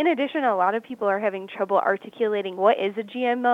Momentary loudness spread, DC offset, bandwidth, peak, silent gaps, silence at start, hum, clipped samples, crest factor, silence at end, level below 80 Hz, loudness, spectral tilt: 5 LU; under 0.1%; 7.6 kHz; -6 dBFS; none; 0 s; none; under 0.1%; 16 dB; 0 s; -80 dBFS; -24 LUFS; -6.5 dB/octave